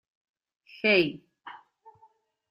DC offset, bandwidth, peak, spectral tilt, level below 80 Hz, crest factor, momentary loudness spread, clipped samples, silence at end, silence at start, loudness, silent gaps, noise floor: under 0.1%; 5.8 kHz; -8 dBFS; -7 dB/octave; -72 dBFS; 22 dB; 25 LU; under 0.1%; 0.95 s; 0.85 s; -25 LUFS; none; -63 dBFS